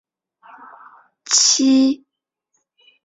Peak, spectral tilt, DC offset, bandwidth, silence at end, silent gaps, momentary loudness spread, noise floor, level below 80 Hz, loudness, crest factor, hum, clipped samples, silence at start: -2 dBFS; 0 dB/octave; under 0.1%; 8.4 kHz; 1.1 s; none; 8 LU; -77 dBFS; -68 dBFS; -14 LUFS; 18 dB; none; under 0.1%; 1.3 s